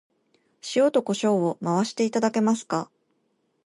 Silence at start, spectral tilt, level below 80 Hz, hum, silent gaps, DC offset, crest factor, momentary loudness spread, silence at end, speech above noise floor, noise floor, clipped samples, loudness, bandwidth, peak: 0.65 s; -5.5 dB/octave; -76 dBFS; none; none; under 0.1%; 16 dB; 8 LU; 0.8 s; 48 dB; -71 dBFS; under 0.1%; -24 LUFS; 11.5 kHz; -10 dBFS